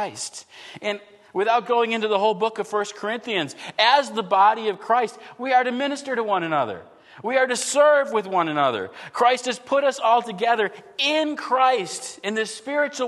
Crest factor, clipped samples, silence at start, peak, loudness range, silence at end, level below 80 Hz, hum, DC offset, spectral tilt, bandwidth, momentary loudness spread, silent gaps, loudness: 18 dB; under 0.1%; 0 s; -4 dBFS; 3 LU; 0 s; -78 dBFS; none; under 0.1%; -2.5 dB/octave; 12.5 kHz; 12 LU; none; -22 LUFS